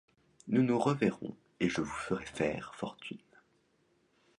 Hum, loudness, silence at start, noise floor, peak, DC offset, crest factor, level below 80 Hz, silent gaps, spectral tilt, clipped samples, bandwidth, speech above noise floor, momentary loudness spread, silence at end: none; -33 LUFS; 0.45 s; -72 dBFS; -14 dBFS; under 0.1%; 20 dB; -64 dBFS; none; -6.5 dB/octave; under 0.1%; 11 kHz; 40 dB; 17 LU; 1.2 s